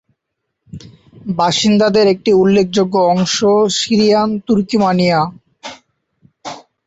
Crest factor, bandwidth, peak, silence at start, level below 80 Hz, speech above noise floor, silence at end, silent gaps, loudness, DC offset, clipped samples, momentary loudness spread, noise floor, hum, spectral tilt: 12 dB; 8 kHz; -2 dBFS; 0.75 s; -52 dBFS; 62 dB; 0.25 s; none; -13 LUFS; under 0.1%; under 0.1%; 20 LU; -75 dBFS; none; -5 dB/octave